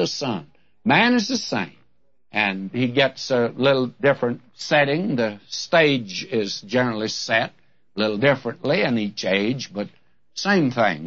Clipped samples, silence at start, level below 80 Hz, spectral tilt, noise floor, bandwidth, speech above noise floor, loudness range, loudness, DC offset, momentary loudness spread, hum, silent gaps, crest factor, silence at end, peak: under 0.1%; 0 s; -64 dBFS; -5 dB/octave; -68 dBFS; 7.8 kHz; 47 dB; 2 LU; -21 LUFS; 0.2%; 10 LU; none; none; 20 dB; 0 s; -2 dBFS